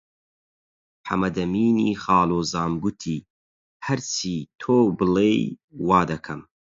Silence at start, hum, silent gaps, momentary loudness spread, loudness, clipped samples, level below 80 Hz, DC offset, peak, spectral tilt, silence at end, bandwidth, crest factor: 1.05 s; none; 3.30-3.80 s, 5.64-5.68 s; 12 LU; -23 LUFS; under 0.1%; -52 dBFS; under 0.1%; -4 dBFS; -5.5 dB/octave; 0.35 s; 7.8 kHz; 20 dB